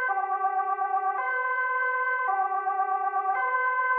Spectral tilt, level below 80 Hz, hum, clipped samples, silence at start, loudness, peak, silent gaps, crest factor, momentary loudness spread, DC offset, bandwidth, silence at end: -3.5 dB/octave; -84 dBFS; none; under 0.1%; 0 s; -26 LUFS; -16 dBFS; none; 12 dB; 2 LU; under 0.1%; 3.8 kHz; 0 s